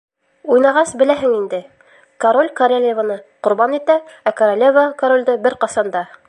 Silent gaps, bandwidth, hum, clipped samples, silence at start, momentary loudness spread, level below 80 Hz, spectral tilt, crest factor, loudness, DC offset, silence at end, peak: none; 11 kHz; none; under 0.1%; 0.45 s; 9 LU; -64 dBFS; -4 dB/octave; 14 dB; -15 LUFS; under 0.1%; 0.25 s; -2 dBFS